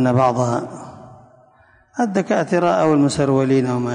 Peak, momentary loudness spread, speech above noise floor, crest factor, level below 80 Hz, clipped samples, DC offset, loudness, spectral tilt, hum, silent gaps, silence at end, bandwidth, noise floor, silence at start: -4 dBFS; 17 LU; 36 dB; 14 dB; -52 dBFS; under 0.1%; under 0.1%; -18 LUFS; -6.5 dB/octave; none; none; 0 s; 10.5 kHz; -53 dBFS; 0 s